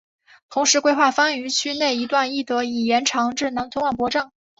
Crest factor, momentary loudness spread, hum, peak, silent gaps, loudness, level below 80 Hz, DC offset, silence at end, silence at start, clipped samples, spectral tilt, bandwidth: 18 dB; 7 LU; none; -4 dBFS; none; -20 LUFS; -60 dBFS; under 0.1%; 0.35 s; 0.5 s; under 0.1%; -1.5 dB/octave; 8 kHz